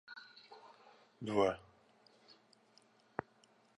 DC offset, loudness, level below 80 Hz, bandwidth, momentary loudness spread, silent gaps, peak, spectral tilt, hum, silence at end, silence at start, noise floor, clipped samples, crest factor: under 0.1%; -39 LUFS; -74 dBFS; 10.5 kHz; 27 LU; none; -18 dBFS; -6 dB/octave; none; 2.2 s; 0.1 s; -70 dBFS; under 0.1%; 24 dB